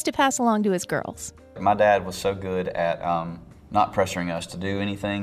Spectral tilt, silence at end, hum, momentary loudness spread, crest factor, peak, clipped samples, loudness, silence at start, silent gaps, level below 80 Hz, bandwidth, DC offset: -4.5 dB/octave; 0 s; none; 11 LU; 18 dB; -6 dBFS; under 0.1%; -24 LUFS; 0 s; none; -52 dBFS; 15 kHz; under 0.1%